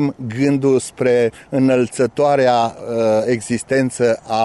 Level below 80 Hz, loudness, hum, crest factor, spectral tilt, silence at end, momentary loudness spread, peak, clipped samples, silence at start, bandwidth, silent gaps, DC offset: -56 dBFS; -17 LUFS; none; 12 dB; -6 dB/octave; 0 s; 5 LU; -4 dBFS; under 0.1%; 0 s; 11.5 kHz; none; under 0.1%